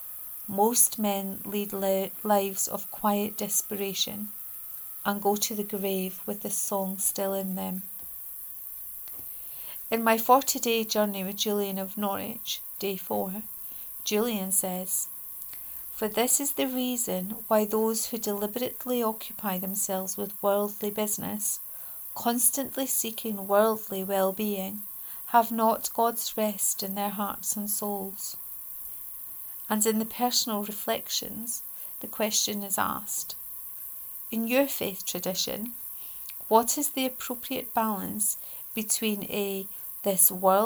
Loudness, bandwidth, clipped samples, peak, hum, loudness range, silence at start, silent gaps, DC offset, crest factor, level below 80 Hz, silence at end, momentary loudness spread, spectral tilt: -28 LUFS; over 20 kHz; under 0.1%; -6 dBFS; none; 3 LU; 0 s; none; under 0.1%; 24 dB; -66 dBFS; 0 s; 11 LU; -3 dB/octave